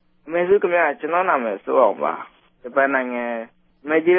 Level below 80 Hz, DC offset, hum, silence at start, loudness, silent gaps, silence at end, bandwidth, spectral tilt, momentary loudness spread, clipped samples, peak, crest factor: -66 dBFS; under 0.1%; none; 0.25 s; -20 LUFS; none; 0 s; 3.6 kHz; -10 dB/octave; 17 LU; under 0.1%; -4 dBFS; 16 dB